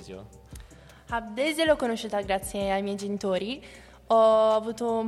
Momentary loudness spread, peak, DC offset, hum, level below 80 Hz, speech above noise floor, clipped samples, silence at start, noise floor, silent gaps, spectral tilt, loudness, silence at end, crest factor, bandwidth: 15 LU; -10 dBFS; under 0.1%; none; -52 dBFS; 23 dB; under 0.1%; 0 s; -49 dBFS; none; -4.5 dB/octave; -26 LUFS; 0 s; 16 dB; 13 kHz